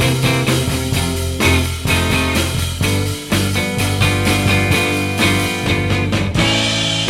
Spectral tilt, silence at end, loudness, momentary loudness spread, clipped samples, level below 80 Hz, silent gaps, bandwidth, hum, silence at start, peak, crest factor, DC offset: -4 dB/octave; 0 s; -16 LUFS; 4 LU; under 0.1%; -30 dBFS; none; 16.5 kHz; none; 0 s; 0 dBFS; 16 dB; under 0.1%